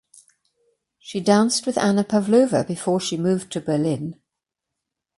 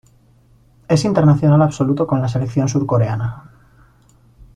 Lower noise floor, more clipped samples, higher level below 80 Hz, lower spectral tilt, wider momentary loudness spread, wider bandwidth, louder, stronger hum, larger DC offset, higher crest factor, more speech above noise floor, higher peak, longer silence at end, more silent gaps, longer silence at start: first, -84 dBFS vs -52 dBFS; neither; second, -62 dBFS vs -46 dBFS; second, -5 dB/octave vs -7.5 dB/octave; about the same, 8 LU vs 9 LU; first, 11.5 kHz vs 10 kHz; second, -21 LUFS vs -16 LUFS; neither; neither; about the same, 18 dB vs 14 dB; first, 63 dB vs 36 dB; about the same, -4 dBFS vs -2 dBFS; about the same, 1.05 s vs 1.15 s; neither; first, 1.05 s vs 0.9 s